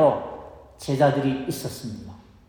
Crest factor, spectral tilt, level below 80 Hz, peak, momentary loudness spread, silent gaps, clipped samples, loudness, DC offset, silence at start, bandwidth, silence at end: 18 dB; -6.5 dB/octave; -54 dBFS; -6 dBFS; 20 LU; none; under 0.1%; -24 LUFS; under 0.1%; 0 s; over 20 kHz; 0.3 s